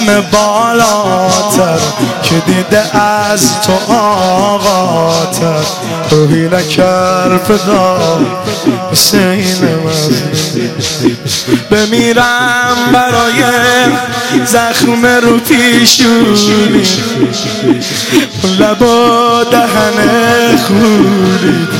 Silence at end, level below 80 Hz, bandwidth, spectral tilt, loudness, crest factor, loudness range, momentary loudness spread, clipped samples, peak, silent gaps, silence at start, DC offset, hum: 0 s; -42 dBFS; 17.5 kHz; -4 dB/octave; -9 LUFS; 8 dB; 3 LU; 5 LU; 0.2%; 0 dBFS; none; 0 s; 0.4%; none